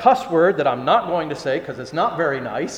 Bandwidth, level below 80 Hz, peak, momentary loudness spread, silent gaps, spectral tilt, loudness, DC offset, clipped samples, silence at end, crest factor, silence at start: 11.5 kHz; -58 dBFS; 0 dBFS; 8 LU; none; -5.5 dB/octave; -20 LUFS; under 0.1%; under 0.1%; 0 s; 20 dB; 0 s